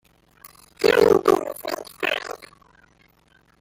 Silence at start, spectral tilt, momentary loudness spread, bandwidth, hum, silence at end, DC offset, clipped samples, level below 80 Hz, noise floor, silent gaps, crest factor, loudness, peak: 0.45 s; -4 dB/octave; 16 LU; 16.5 kHz; none; 1.15 s; under 0.1%; under 0.1%; -58 dBFS; -59 dBFS; none; 20 dB; -21 LUFS; -4 dBFS